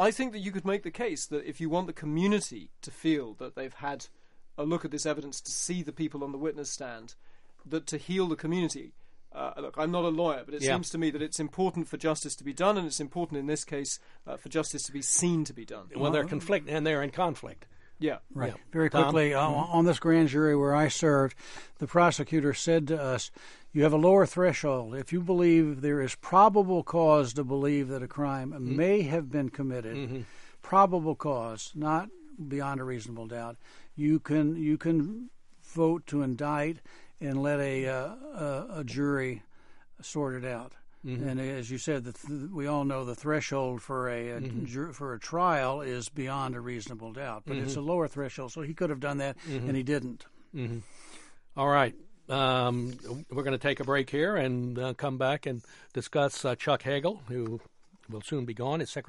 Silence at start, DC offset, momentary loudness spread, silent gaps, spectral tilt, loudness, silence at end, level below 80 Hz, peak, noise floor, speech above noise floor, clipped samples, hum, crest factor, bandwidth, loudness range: 0 s; under 0.1%; 15 LU; none; -5.5 dB/octave; -30 LUFS; 0.05 s; -60 dBFS; -8 dBFS; -50 dBFS; 21 dB; under 0.1%; none; 20 dB; 11.5 kHz; 9 LU